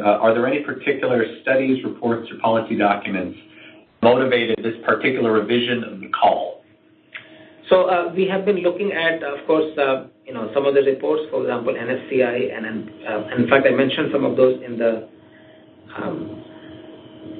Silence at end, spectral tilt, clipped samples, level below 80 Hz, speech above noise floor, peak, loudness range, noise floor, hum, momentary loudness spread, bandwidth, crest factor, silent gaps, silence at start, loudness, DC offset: 0 s; -10.5 dB/octave; under 0.1%; -62 dBFS; 34 dB; -2 dBFS; 2 LU; -54 dBFS; none; 15 LU; 4.6 kHz; 20 dB; none; 0 s; -20 LUFS; under 0.1%